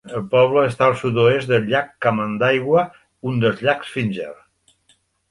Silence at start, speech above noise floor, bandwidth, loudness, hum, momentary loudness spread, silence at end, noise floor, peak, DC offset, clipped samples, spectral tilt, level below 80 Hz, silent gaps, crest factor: 0.05 s; 43 dB; 11.5 kHz; -19 LUFS; none; 9 LU; 0.95 s; -61 dBFS; -2 dBFS; under 0.1%; under 0.1%; -7 dB/octave; -56 dBFS; none; 16 dB